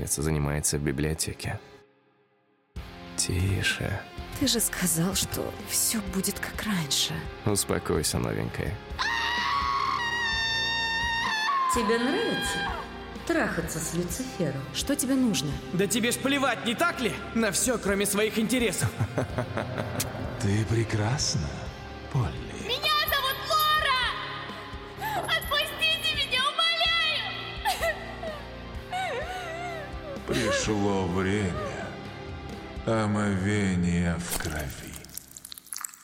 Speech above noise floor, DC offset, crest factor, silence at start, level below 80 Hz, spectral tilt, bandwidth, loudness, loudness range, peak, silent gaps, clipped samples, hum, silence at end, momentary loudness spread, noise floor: 40 dB; under 0.1%; 18 dB; 0 s; -46 dBFS; -3.5 dB/octave; 16.5 kHz; -27 LUFS; 4 LU; -12 dBFS; none; under 0.1%; none; 0 s; 13 LU; -67 dBFS